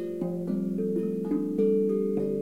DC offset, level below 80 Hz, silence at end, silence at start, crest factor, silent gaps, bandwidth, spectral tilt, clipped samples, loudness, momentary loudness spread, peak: 0.2%; -68 dBFS; 0 s; 0 s; 12 dB; none; 15 kHz; -10.5 dB/octave; under 0.1%; -28 LUFS; 6 LU; -14 dBFS